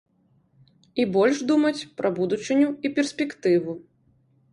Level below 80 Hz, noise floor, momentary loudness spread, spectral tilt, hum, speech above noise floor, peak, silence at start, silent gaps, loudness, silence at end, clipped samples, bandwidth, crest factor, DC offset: -68 dBFS; -64 dBFS; 7 LU; -5.5 dB/octave; none; 41 dB; -8 dBFS; 0.95 s; none; -23 LUFS; 0.75 s; under 0.1%; 11 kHz; 16 dB; under 0.1%